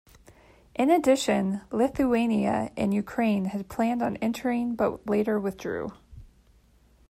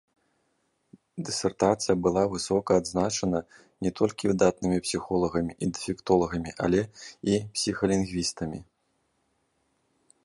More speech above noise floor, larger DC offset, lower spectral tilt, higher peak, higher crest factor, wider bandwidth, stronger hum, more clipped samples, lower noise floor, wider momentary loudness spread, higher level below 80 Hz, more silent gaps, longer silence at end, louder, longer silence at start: second, 34 dB vs 47 dB; neither; about the same, -6 dB/octave vs -5 dB/octave; about the same, -10 dBFS vs -8 dBFS; about the same, 16 dB vs 20 dB; first, 15 kHz vs 11.5 kHz; neither; neither; second, -60 dBFS vs -73 dBFS; about the same, 9 LU vs 9 LU; about the same, -56 dBFS vs -52 dBFS; neither; second, 0.85 s vs 1.6 s; about the same, -26 LUFS vs -27 LUFS; second, 0.8 s vs 1.15 s